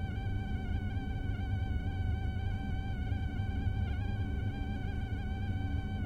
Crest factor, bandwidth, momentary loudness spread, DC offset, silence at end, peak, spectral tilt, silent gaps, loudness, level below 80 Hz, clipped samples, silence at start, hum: 12 dB; 6.4 kHz; 2 LU; under 0.1%; 0 s; -22 dBFS; -8 dB/octave; none; -37 LUFS; -38 dBFS; under 0.1%; 0 s; none